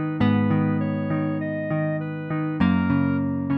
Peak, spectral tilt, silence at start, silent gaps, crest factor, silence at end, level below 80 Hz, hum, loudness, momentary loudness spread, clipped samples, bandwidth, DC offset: -8 dBFS; -10.5 dB/octave; 0 s; none; 16 dB; 0 s; -52 dBFS; none; -23 LUFS; 6 LU; under 0.1%; 5.2 kHz; under 0.1%